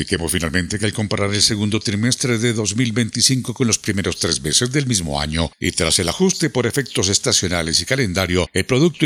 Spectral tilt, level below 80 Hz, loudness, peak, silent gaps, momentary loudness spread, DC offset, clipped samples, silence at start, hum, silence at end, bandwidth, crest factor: -3.5 dB/octave; -42 dBFS; -18 LUFS; 0 dBFS; none; 5 LU; under 0.1%; under 0.1%; 0 s; none; 0 s; 17 kHz; 18 dB